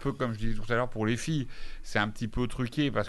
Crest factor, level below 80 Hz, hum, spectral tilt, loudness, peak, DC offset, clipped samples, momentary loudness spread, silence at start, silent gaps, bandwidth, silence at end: 18 dB; -40 dBFS; none; -6 dB/octave; -31 LUFS; -12 dBFS; under 0.1%; under 0.1%; 5 LU; 0 s; none; 12 kHz; 0 s